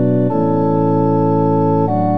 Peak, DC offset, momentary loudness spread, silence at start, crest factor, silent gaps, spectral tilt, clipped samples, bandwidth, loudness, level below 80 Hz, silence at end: -4 dBFS; 3%; 1 LU; 0 s; 10 dB; none; -12 dB/octave; under 0.1%; 5.6 kHz; -15 LUFS; -66 dBFS; 0 s